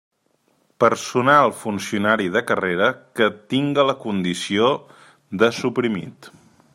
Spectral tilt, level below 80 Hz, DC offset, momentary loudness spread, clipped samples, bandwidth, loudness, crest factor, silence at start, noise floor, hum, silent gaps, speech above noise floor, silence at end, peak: -5 dB/octave; -64 dBFS; under 0.1%; 9 LU; under 0.1%; 16 kHz; -20 LUFS; 20 dB; 0.8 s; -65 dBFS; none; none; 45 dB; 0.45 s; -2 dBFS